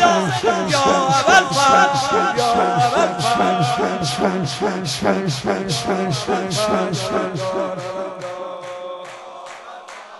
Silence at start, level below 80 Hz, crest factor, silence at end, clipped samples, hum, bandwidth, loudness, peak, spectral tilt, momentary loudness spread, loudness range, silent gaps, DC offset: 0 s; -52 dBFS; 18 dB; 0 s; under 0.1%; none; 12 kHz; -18 LUFS; -2 dBFS; -4 dB/octave; 18 LU; 8 LU; none; under 0.1%